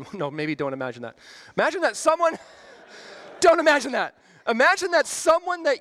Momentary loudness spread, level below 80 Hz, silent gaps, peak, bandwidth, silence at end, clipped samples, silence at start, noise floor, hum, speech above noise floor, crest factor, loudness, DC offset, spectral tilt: 20 LU; -64 dBFS; none; -6 dBFS; 14.5 kHz; 0 s; under 0.1%; 0 s; -45 dBFS; none; 23 dB; 18 dB; -22 LUFS; under 0.1%; -3 dB/octave